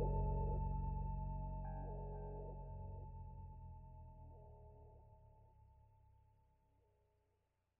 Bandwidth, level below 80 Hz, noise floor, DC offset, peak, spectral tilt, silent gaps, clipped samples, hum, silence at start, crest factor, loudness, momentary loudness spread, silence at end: 2.8 kHz; -50 dBFS; -84 dBFS; under 0.1%; -30 dBFS; -9.5 dB/octave; none; under 0.1%; none; 0 s; 18 dB; -48 LUFS; 22 LU; 2.05 s